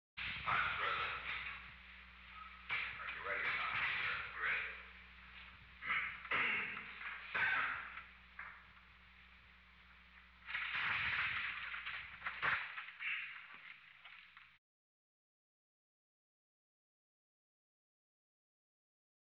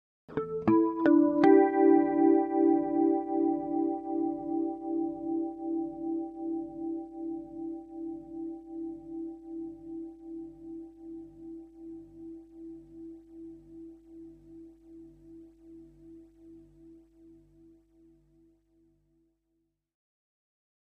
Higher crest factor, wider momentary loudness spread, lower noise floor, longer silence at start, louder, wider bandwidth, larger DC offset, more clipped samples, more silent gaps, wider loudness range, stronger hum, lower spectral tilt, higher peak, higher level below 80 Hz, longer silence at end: about the same, 20 dB vs 22 dB; second, 20 LU vs 25 LU; second, -64 dBFS vs -79 dBFS; second, 0.15 s vs 0.3 s; second, -40 LUFS vs -29 LUFS; first, 7 kHz vs 4.7 kHz; neither; neither; neither; second, 8 LU vs 25 LU; second, none vs 50 Hz at -65 dBFS; second, 1 dB/octave vs -9.5 dB/octave; second, -24 dBFS vs -10 dBFS; about the same, -68 dBFS vs -66 dBFS; first, 4.85 s vs 4 s